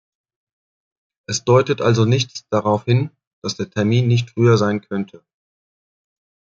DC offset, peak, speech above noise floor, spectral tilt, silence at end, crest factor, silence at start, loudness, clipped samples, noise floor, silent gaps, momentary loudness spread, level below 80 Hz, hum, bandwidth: under 0.1%; -2 dBFS; over 73 dB; -6 dB/octave; 1.5 s; 18 dB; 1.3 s; -18 LUFS; under 0.1%; under -90 dBFS; 3.27-3.42 s; 12 LU; -58 dBFS; none; 7.6 kHz